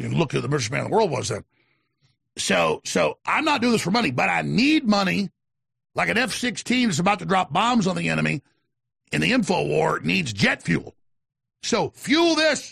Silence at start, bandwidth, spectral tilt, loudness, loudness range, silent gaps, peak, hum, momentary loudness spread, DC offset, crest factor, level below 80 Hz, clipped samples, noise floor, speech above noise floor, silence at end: 0 s; 14 kHz; -4.5 dB/octave; -22 LUFS; 2 LU; none; -8 dBFS; none; 7 LU; under 0.1%; 16 dB; -56 dBFS; under 0.1%; -68 dBFS; 46 dB; 0 s